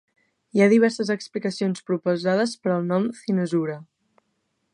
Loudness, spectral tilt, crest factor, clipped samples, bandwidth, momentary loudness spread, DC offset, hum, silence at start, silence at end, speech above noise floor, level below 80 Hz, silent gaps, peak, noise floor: -23 LUFS; -6.5 dB/octave; 18 dB; under 0.1%; 11 kHz; 9 LU; under 0.1%; none; 0.55 s; 0.9 s; 51 dB; -74 dBFS; none; -6 dBFS; -73 dBFS